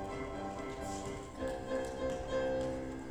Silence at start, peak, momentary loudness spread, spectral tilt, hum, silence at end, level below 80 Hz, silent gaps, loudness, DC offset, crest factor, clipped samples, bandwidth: 0 s; -24 dBFS; 6 LU; -5.5 dB/octave; none; 0 s; -52 dBFS; none; -39 LUFS; under 0.1%; 14 dB; under 0.1%; 15.5 kHz